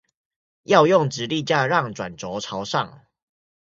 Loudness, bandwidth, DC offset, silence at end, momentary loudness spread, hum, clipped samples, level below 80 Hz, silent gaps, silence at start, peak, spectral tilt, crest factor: -21 LUFS; 7.8 kHz; under 0.1%; 0.8 s; 14 LU; none; under 0.1%; -62 dBFS; none; 0.7 s; 0 dBFS; -5 dB/octave; 22 dB